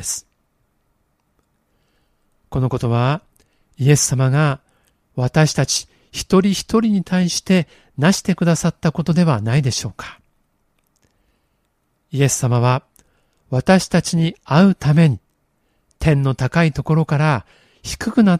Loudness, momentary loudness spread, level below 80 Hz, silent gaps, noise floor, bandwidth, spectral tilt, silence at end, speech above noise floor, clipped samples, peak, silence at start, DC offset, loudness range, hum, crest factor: -17 LUFS; 13 LU; -44 dBFS; none; -67 dBFS; 15 kHz; -5.5 dB/octave; 0 s; 51 dB; under 0.1%; 0 dBFS; 0 s; under 0.1%; 6 LU; none; 18 dB